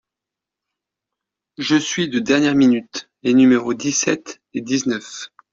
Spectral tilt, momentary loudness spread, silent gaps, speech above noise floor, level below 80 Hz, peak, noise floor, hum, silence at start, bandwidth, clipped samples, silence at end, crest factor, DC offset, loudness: -4 dB/octave; 16 LU; none; 68 dB; -60 dBFS; -2 dBFS; -86 dBFS; none; 1.6 s; 7.6 kHz; under 0.1%; 0.25 s; 18 dB; under 0.1%; -18 LUFS